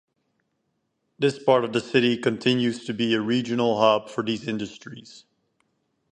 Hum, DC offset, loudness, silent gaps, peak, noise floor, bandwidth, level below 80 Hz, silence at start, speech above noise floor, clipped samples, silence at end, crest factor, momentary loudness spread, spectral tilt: none; under 0.1%; -23 LUFS; none; -4 dBFS; -75 dBFS; 9.4 kHz; -68 dBFS; 1.2 s; 52 dB; under 0.1%; 0.95 s; 20 dB; 11 LU; -5.5 dB/octave